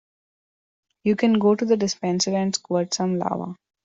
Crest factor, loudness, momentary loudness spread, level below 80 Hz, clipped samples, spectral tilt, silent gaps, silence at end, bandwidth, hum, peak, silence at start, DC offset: 16 dB; -22 LUFS; 9 LU; -66 dBFS; under 0.1%; -5 dB/octave; none; 0.3 s; 8 kHz; none; -8 dBFS; 1.05 s; under 0.1%